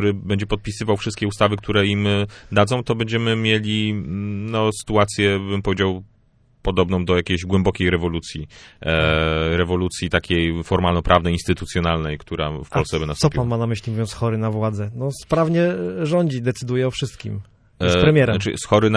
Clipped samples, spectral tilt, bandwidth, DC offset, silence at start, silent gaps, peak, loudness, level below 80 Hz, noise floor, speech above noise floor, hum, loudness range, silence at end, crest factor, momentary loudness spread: under 0.1%; -6 dB/octave; 11 kHz; under 0.1%; 0 s; none; 0 dBFS; -20 LUFS; -38 dBFS; -57 dBFS; 37 dB; none; 2 LU; 0 s; 20 dB; 8 LU